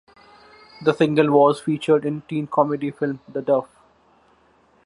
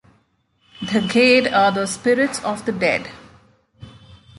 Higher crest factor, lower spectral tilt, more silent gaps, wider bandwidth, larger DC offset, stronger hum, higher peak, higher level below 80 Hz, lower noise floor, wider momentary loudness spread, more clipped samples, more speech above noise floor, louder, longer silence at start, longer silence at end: about the same, 20 dB vs 18 dB; first, -7.5 dB/octave vs -4 dB/octave; neither; about the same, 11.5 kHz vs 11.5 kHz; neither; neither; about the same, -2 dBFS vs -2 dBFS; second, -66 dBFS vs -56 dBFS; second, -58 dBFS vs -63 dBFS; about the same, 10 LU vs 11 LU; neither; second, 38 dB vs 45 dB; second, -21 LUFS vs -18 LUFS; about the same, 0.8 s vs 0.8 s; first, 1.2 s vs 0.25 s